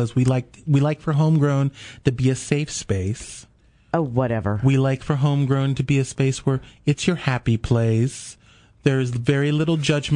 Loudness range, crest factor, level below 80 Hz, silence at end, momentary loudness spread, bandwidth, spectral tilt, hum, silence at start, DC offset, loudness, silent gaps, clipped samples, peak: 2 LU; 18 dB; -46 dBFS; 0 s; 6 LU; 10.5 kHz; -6.5 dB/octave; none; 0 s; under 0.1%; -21 LUFS; none; under 0.1%; -4 dBFS